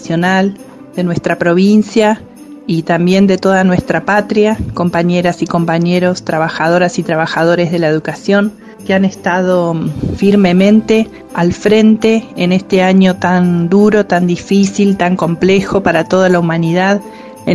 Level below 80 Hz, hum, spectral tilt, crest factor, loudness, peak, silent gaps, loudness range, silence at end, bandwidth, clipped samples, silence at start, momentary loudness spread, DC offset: -42 dBFS; none; -6.5 dB/octave; 12 dB; -12 LUFS; 0 dBFS; none; 3 LU; 0 s; 12 kHz; under 0.1%; 0 s; 7 LU; under 0.1%